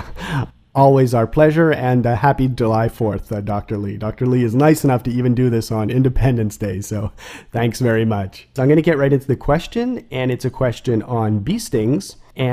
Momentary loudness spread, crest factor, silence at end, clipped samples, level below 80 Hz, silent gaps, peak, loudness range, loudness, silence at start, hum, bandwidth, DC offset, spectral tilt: 11 LU; 16 dB; 0 s; under 0.1%; -34 dBFS; none; 0 dBFS; 3 LU; -18 LUFS; 0 s; none; 15.5 kHz; under 0.1%; -7.5 dB/octave